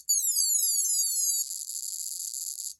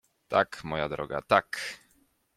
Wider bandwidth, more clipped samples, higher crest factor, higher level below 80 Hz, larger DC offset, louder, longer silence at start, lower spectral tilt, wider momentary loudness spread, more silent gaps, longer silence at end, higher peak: first, 17 kHz vs 14.5 kHz; neither; second, 16 dB vs 24 dB; second, -84 dBFS vs -60 dBFS; neither; first, -25 LUFS vs -29 LUFS; second, 0.1 s vs 0.3 s; second, 7 dB/octave vs -4.5 dB/octave; about the same, 10 LU vs 11 LU; neither; second, 0.05 s vs 0.6 s; second, -12 dBFS vs -6 dBFS